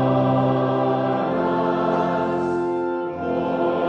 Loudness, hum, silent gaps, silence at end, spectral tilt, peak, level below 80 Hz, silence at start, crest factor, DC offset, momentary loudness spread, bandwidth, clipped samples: -22 LUFS; none; none; 0 s; -9 dB/octave; -8 dBFS; -56 dBFS; 0 s; 14 dB; under 0.1%; 5 LU; 7.6 kHz; under 0.1%